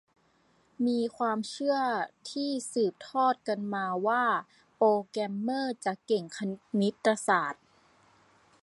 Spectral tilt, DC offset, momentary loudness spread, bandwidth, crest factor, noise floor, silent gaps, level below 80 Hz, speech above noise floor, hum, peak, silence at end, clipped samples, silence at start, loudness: -5 dB/octave; under 0.1%; 8 LU; 11.5 kHz; 20 dB; -67 dBFS; none; -80 dBFS; 38 dB; none; -10 dBFS; 1.1 s; under 0.1%; 0.8 s; -30 LUFS